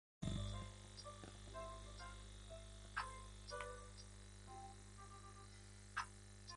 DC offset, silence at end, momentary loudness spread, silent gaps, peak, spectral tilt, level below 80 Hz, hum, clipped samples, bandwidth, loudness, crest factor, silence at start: under 0.1%; 0 s; 10 LU; none; -30 dBFS; -4 dB/octave; -58 dBFS; 50 Hz at -60 dBFS; under 0.1%; 11.5 kHz; -53 LUFS; 22 dB; 0.2 s